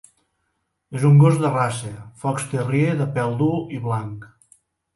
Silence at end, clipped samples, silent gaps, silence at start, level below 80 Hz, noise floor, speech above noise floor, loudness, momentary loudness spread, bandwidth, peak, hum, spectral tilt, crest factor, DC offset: 0.7 s; under 0.1%; none; 0.9 s; -58 dBFS; -73 dBFS; 54 dB; -20 LUFS; 18 LU; 11.5 kHz; -4 dBFS; none; -7.5 dB/octave; 18 dB; under 0.1%